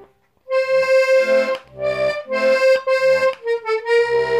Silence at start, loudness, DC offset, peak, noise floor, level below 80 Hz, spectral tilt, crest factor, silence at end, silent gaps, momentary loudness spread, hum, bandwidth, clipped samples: 0 s; -17 LUFS; under 0.1%; -6 dBFS; -46 dBFS; -58 dBFS; -3.5 dB/octave; 12 dB; 0 s; none; 9 LU; none; 13.5 kHz; under 0.1%